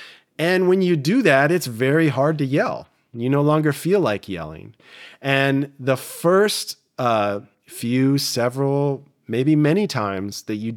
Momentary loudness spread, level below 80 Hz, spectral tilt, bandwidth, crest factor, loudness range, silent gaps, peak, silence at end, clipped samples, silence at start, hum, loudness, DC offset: 13 LU; -66 dBFS; -5.5 dB/octave; 17.5 kHz; 18 dB; 3 LU; none; -2 dBFS; 0 s; under 0.1%; 0 s; none; -20 LUFS; under 0.1%